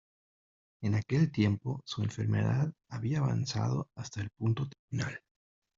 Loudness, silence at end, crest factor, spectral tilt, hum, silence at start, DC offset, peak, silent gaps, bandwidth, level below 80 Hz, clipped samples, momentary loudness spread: -33 LUFS; 0.6 s; 18 dB; -7 dB/octave; none; 0.8 s; under 0.1%; -16 dBFS; 4.79-4.88 s; 7.6 kHz; -62 dBFS; under 0.1%; 9 LU